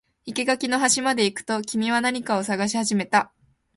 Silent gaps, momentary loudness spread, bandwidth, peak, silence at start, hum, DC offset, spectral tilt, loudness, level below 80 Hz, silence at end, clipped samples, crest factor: none; 7 LU; 11.5 kHz; -6 dBFS; 0.25 s; none; under 0.1%; -3 dB/octave; -23 LUFS; -66 dBFS; 0.5 s; under 0.1%; 18 dB